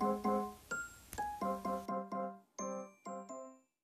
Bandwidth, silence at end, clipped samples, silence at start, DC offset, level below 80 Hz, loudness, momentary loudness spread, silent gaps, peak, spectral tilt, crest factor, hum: 14 kHz; 0.25 s; under 0.1%; 0 s; under 0.1%; -66 dBFS; -42 LUFS; 12 LU; none; -24 dBFS; -5.5 dB/octave; 18 dB; none